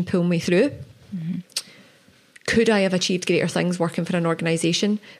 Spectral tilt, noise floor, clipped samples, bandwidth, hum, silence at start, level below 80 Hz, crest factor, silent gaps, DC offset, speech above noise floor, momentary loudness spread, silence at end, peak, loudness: -5 dB/octave; -54 dBFS; under 0.1%; 13.5 kHz; none; 0 s; -56 dBFS; 16 dB; none; under 0.1%; 33 dB; 12 LU; 0.05 s; -6 dBFS; -22 LUFS